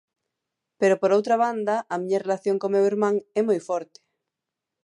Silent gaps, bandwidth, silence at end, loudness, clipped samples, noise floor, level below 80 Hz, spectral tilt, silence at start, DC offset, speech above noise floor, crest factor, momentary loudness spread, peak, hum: none; 10.5 kHz; 1 s; -23 LUFS; under 0.1%; -86 dBFS; -80 dBFS; -6 dB/octave; 0.8 s; under 0.1%; 63 dB; 16 dB; 6 LU; -8 dBFS; none